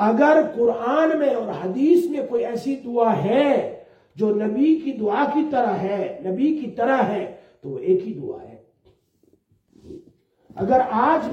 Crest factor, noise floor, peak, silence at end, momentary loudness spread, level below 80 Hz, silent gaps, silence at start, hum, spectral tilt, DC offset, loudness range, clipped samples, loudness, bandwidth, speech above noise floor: 18 dB; -62 dBFS; -4 dBFS; 0 s; 11 LU; -64 dBFS; none; 0 s; none; -7.5 dB/octave; under 0.1%; 7 LU; under 0.1%; -21 LUFS; 13.5 kHz; 42 dB